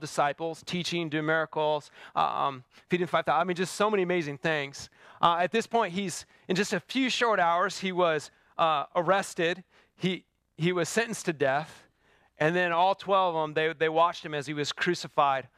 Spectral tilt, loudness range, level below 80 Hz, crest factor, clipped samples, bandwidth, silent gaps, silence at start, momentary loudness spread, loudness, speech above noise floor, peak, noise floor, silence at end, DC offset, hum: -4.5 dB/octave; 2 LU; -72 dBFS; 22 dB; under 0.1%; 15 kHz; none; 0 s; 9 LU; -28 LUFS; 38 dB; -8 dBFS; -66 dBFS; 0.1 s; under 0.1%; none